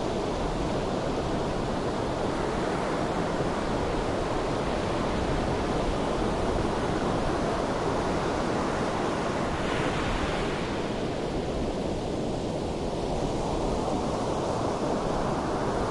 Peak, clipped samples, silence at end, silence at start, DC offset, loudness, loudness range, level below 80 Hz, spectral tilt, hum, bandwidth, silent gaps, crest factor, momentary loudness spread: -14 dBFS; under 0.1%; 0 s; 0 s; under 0.1%; -29 LUFS; 2 LU; -38 dBFS; -6 dB/octave; none; 11.5 kHz; none; 14 dB; 3 LU